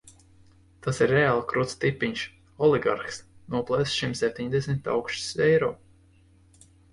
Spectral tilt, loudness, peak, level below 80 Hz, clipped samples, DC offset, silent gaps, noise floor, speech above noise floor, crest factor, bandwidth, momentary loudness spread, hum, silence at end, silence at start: -5 dB/octave; -26 LUFS; -10 dBFS; -56 dBFS; under 0.1%; under 0.1%; none; -58 dBFS; 33 dB; 18 dB; 11.5 kHz; 12 LU; none; 1.15 s; 0.85 s